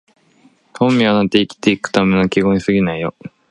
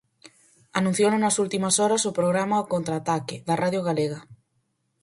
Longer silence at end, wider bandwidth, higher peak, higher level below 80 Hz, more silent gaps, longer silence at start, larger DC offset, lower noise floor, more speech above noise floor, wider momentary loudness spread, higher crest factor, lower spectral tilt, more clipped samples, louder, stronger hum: second, 0.2 s vs 0.7 s; about the same, 10.5 kHz vs 11.5 kHz; first, 0 dBFS vs -6 dBFS; first, -46 dBFS vs -66 dBFS; neither; first, 0.75 s vs 0.25 s; neither; second, -53 dBFS vs -73 dBFS; second, 38 dB vs 49 dB; about the same, 6 LU vs 7 LU; about the same, 16 dB vs 20 dB; first, -6 dB/octave vs -4.5 dB/octave; neither; first, -15 LUFS vs -24 LUFS; neither